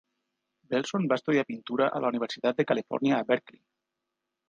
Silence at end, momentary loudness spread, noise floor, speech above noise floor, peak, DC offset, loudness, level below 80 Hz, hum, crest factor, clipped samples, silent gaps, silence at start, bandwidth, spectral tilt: 1.1 s; 4 LU; -85 dBFS; 57 dB; -10 dBFS; under 0.1%; -28 LUFS; -80 dBFS; none; 20 dB; under 0.1%; none; 0.7 s; 7.6 kHz; -6 dB/octave